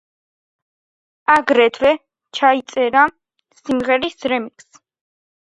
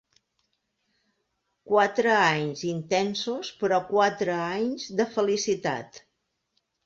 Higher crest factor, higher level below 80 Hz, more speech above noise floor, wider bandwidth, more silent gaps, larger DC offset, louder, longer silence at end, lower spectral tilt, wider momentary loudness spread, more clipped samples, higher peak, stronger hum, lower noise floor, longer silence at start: about the same, 18 dB vs 20 dB; first, -58 dBFS vs -70 dBFS; first, over 74 dB vs 52 dB; first, 10.5 kHz vs 7.8 kHz; neither; neither; first, -17 LUFS vs -25 LUFS; first, 1.1 s vs 0.9 s; about the same, -3.5 dB/octave vs -4 dB/octave; about the same, 11 LU vs 9 LU; neither; first, 0 dBFS vs -8 dBFS; neither; first, under -90 dBFS vs -78 dBFS; second, 1.3 s vs 1.65 s